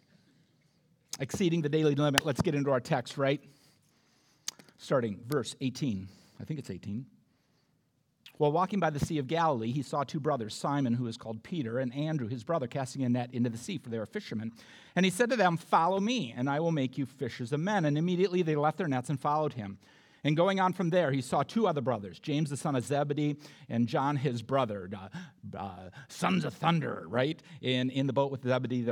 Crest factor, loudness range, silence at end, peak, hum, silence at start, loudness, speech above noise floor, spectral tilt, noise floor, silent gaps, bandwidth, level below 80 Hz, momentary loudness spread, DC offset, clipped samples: 28 dB; 5 LU; 0 s; -4 dBFS; none; 1.15 s; -31 LUFS; 43 dB; -6 dB/octave; -73 dBFS; none; 18 kHz; -68 dBFS; 13 LU; under 0.1%; under 0.1%